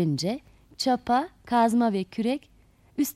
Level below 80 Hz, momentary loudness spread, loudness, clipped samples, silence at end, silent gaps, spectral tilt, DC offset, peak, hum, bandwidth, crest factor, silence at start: -60 dBFS; 10 LU; -26 LUFS; under 0.1%; 0.05 s; none; -5.5 dB/octave; under 0.1%; -12 dBFS; none; 15.5 kHz; 14 dB; 0 s